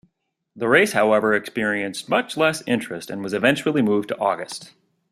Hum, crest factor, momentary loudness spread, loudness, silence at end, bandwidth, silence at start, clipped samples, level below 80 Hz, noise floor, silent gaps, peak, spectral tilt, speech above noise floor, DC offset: none; 20 dB; 11 LU; -21 LUFS; 0.45 s; 14.5 kHz; 0.55 s; under 0.1%; -64 dBFS; -73 dBFS; none; -2 dBFS; -4.5 dB/octave; 53 dB; under 0.1%